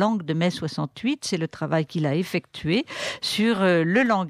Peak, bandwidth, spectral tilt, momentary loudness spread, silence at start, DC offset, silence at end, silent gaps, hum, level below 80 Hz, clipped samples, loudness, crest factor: -10 dBFS; 15 kHz; -5.5 dB/octave; 8 LU; 0 s; under 0.1%; 0 s; none; none; -62 dBFS; under 0.1%; -24 LUFS; 14 dB